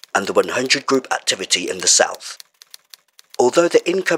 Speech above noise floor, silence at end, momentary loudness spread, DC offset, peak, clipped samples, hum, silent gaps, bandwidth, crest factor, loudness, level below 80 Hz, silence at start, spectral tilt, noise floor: 30 dB; 0 s; 17 LU; under 0.1%; -2 dBFS; under 0.1%; none; none; 16.5 kHz; 18 dB; -17 LUFS; -70 dBFS; 0.15 s; -1.5 dB/octave; -48 dBFS